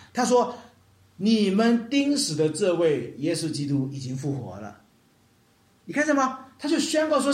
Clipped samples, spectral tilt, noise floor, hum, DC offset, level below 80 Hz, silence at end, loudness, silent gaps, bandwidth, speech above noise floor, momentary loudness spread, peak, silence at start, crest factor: under 0.1%; -5 dB/octave; -61 dBFS; none; under 0.1%; -70 dBFS; 0 s; -24 LUFS; none; 15 kHz; 37 dB; 10 LU; -10 dBFS; 0 s; 16 dB